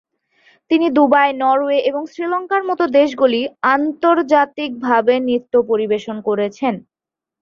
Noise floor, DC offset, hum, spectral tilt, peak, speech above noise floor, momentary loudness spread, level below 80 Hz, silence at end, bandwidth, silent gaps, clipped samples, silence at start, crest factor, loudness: -56 dBFS; under 0.1%; none; -6 dB/octave; -2 dBFS; 40 dB; 8 LU; -64 dBFS; 0.6 s; 7.2 kHz; none; under 0.1%; 0.7 s; 16 dB; -16 LUFS